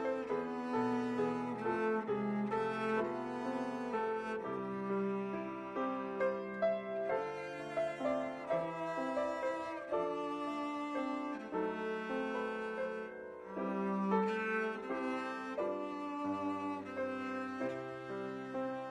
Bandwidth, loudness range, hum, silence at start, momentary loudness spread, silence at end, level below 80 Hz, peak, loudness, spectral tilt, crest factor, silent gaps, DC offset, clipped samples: 11.5 kHz; 3 LU; none; 0 s; 6 LU; 0 s; -74 dBFS; -20 dBFS; -38 LUFS; -7 dB/octave; 18 dB; none; under 0.1%; under 0.1%